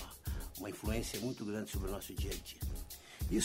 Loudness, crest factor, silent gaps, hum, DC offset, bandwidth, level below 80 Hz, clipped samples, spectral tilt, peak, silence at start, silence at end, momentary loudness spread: -42 LUFS; 18 dB; none; none; under 0.1%; 16 kHz; -44 dBFS; under 0.1%; -4.5 dB/octave; -22 dBFS; 0 s; 0 s; 6 LU